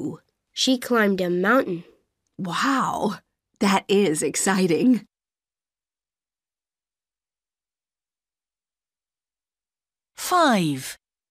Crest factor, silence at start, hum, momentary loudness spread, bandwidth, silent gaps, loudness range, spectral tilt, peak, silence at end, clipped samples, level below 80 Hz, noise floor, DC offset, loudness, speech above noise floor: 18 dB; 0 s; none; 14 LU; 15.5 kHz; none; 6 LU; -4 dB/octave; -8 dBFS; 0.35 s; under 0.1%; -66 dBFS; under -90 dBFS; under 0.1%; -22 LUFS; over 69 dB